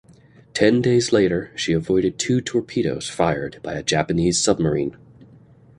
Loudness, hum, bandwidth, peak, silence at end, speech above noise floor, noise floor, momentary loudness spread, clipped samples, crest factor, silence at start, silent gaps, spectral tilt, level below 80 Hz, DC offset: -21 LUFS; none; 11.5 kHz; -2 dBFS; 0.85 s; 30 dB; -50 dBFS; 8 LU; under 0.1%; 20 dB; 0.55 s; none; -4.5 dB/octave; -46 dBFS; under 0.1%